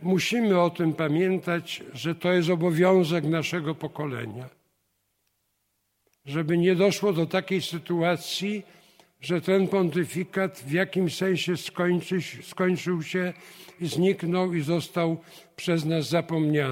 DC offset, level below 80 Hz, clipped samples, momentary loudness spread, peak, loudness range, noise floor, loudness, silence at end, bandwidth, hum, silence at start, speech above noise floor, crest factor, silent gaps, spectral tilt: under 0.1%; -70 dBFS; under 0.1%; 11 LU; -8 dBFS; 3 LU; -75 dBFS; -26 LUFS; 0 s; 16.5 kHz; none; 0 s; 50 dB; 18 dB; none; -6 dB/octave